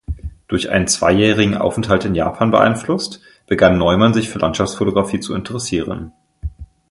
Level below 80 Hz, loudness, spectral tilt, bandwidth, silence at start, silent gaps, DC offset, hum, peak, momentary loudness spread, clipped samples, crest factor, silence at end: -36 dBFS; -16 LUFS; -5 dB/octave; 11.5 kHz; 0.1 s; none; under 0.1%; none; 0 dBFS; 16 LU; under 0.1%; 16 dB; 0.25 s